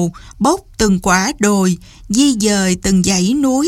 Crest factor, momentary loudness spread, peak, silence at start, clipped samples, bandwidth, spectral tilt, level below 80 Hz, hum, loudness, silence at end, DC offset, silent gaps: 14 dB; 5 LU; 0 dBFS; 0 s; under 0.1%; 15.5 kHz; -4.5 dB/octave; -36 dBFS; none; -14 LUFS; 0 s; under 0.1%; none